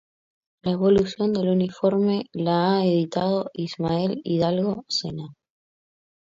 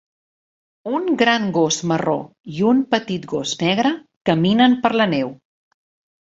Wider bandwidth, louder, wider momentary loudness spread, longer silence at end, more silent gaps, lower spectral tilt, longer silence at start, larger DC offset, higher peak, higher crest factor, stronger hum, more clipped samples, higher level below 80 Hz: about the same, 7.6 kHz vs 7.8 kHz; second, -23 LUFS vs -19 LUFS; about the same, 8 LU vs 10 LU; about the same, 0.9 s vs 0.95 s; second, none vs 2.40-2.44 s, 4.17-4.21 s; first, -7 dB/octave vs -4.5 dB/octave; second, 0.65 s vs 0.85 s; neither; second, -8 dBFS vs -2 dBFS; about the same, 16 dB vs 18 dB; neither; neither; about the same, -56 dBFS vs -60 dBFS